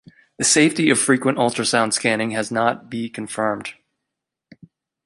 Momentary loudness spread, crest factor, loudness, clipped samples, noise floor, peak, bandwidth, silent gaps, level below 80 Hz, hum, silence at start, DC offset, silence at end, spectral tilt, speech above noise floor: 13 LU; 18 dB; -19 LUFS; under 0.1%; -82 dBFS; -2 dBFS; 11.5 kHz; none; -62 dBFS; none; 0.4 s; under 0.1%; 1.35 s; -3 dB/octave; 63 dB